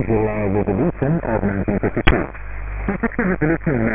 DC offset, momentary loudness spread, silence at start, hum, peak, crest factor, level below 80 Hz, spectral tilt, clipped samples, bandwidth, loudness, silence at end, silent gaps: under 0.1%; 8 LU; 0 s; none; 0 dBFS; 18 dB; -30 dBFS; -11.5 dB/octave; under 0.1%; 4 kHz; -20 LUFS; 0 s; none